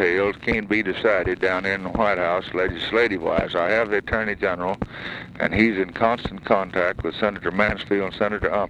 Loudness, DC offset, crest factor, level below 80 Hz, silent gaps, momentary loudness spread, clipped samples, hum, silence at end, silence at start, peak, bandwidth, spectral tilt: -22 LUFS; under 0.1%; 20 dB; -42 dBFS; none; 5 LU; under 0.1%; none; 0 s; 0 s; -4 dBFS; 10 kHz; -6.5 dB/octave